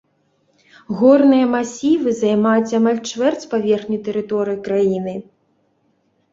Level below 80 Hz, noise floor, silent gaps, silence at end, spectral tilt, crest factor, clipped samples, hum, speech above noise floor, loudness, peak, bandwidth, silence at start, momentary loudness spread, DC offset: -60 dBFS; -63 dBFS; none; 1.1 s; -6 dB/octave; 16 dB; under 0.1%; none; 47 dB; -17 LUFS; -2 dBFS; 7.8 kHz; 0.9 s; 10 LU; under 0.1%